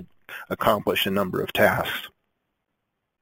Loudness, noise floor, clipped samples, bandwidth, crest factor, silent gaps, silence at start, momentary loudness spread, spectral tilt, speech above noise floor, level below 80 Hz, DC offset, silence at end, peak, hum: -23 LUFS; -79 dBFS; under 0.1%; 17 kHz; 24 dB; none; 0 s; 19 LU; -4.5 dB/octave; 56 dB; -56 dBFS; under 0.1%; 1.15 s; -2 dBFS; none